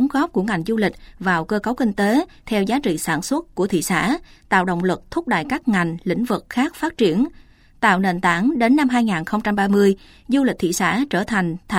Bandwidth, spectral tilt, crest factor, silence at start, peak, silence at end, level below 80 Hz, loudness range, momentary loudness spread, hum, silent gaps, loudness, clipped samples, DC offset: 16.5 kHz; -5.5 dB/octave; 18 dB; 0 s; -2 dBFS; 0 s; -48 dBFS; 3 LU; 6 LU; none; none; -20 LUFS; under 0.1%; under 0.1%